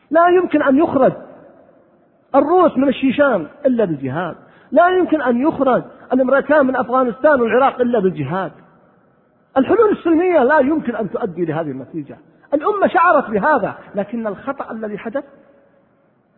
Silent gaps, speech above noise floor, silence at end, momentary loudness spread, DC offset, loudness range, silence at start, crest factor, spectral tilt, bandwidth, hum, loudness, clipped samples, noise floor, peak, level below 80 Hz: none; 42 dB; 1.15 s; 12 LU; under 0.1%; 3 LU; 0.1 s; 16 dB; -11 dB/octave; 4.2 kHz; none; -16 LUFS; under 0.1%; -57 dBFS; 0 dBFS; -56 dBFS